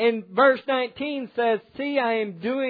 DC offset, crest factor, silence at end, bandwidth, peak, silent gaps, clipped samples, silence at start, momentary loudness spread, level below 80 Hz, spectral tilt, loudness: under 0.1%; 16 dB; 0 s; 4.9 kHz; -6 dBFS; none; under 0.1%; 0 s; 9 LU; -70 dBFS; -8 dB/octave; -24 LUFS